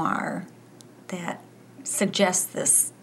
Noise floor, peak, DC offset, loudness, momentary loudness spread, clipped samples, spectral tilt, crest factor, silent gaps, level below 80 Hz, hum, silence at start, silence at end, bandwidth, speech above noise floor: -49 dBFS; -6 dBFS; under 0.1%; -24 LUFS; 18 LU; under 0.1%; -2.5 dB/octave; 20 dB; none; -78 dBFS; none; 0 s; 0.15 s; 16 kHz; 25 dB